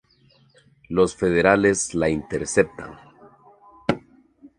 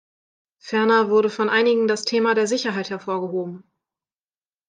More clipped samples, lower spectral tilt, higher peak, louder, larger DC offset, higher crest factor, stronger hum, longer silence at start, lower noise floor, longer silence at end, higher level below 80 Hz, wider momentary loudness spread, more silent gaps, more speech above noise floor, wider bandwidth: neither; about the same, -5 dB/octave vs -4 dB/octave; first, 0 dBFS vs -6 dBFS; about the same, -22 LUFS vs -20 LUFS; neither; first, 24 dB vs 16 dB; neither; first, 0.9 s vs 0.65 s; second, -58 dBFS vs under -90 dBFS; second, 0.1 s vs 1.1 s; first, -48 dBFS vs -76 dBFS; first, 13 LU vs 10 LU; neither; second, 37 dB vs over 70 dB; first, 11.5 kHz vs 9.4 kHz